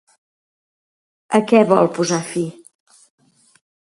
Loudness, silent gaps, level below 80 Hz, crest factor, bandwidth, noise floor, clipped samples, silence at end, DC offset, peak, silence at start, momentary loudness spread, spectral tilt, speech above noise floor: -17 LUFS; none; -68 dBFS; 20 dB; 11.5 kHz; under -90 dBFS; under 0.1%; 1.45 s; under 0.1%; 0 dBFS; 1.3 s; 12 LU; -5.5 dB/octave; over 74 dB